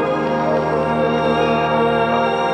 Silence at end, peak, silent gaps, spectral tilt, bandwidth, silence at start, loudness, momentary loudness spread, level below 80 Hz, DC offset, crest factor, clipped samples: 0 s; -4 dBFS; none; -7 dB/octave; 9 kHz; 0 s; -17 LUFS; 2 LU; -44 dBFS; under 0.1%; 12 dB; under 0.1%